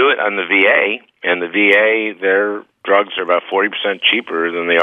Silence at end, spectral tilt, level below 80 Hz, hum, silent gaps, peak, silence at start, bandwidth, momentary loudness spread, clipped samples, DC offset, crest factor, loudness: 0 s; -5 dB/octave; -76 dBFS; none; none; 0 dBFS; 0 s; 4 kHz; 8 LU; under 0.1%; under 0.1%; 16 dB; -14 LUFS